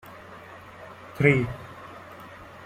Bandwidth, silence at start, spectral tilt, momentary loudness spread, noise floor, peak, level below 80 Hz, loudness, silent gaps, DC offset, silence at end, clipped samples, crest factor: 15 kHz; 0.05 s; -7.5 dB/octave; 23 LU; -45 dBFS; -4 dBFS; -54 dBFS; -23 LUFS; none; under 0.1%; 0 s; under 0.1%; 26 dB